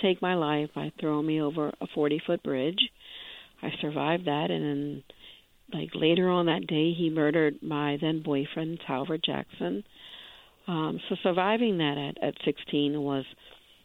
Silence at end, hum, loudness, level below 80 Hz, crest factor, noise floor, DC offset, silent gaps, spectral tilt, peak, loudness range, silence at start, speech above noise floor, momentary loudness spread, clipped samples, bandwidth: 0.3 s; none; -29 LUFS; -68 dBFS; 20 dB; -54 dBFS; under 0.1%; none; -8 dB/octave; -10 dBFS; 5 LU; 0 s; 26 dB; 14 LU; under 0.1%; 4.2 kHz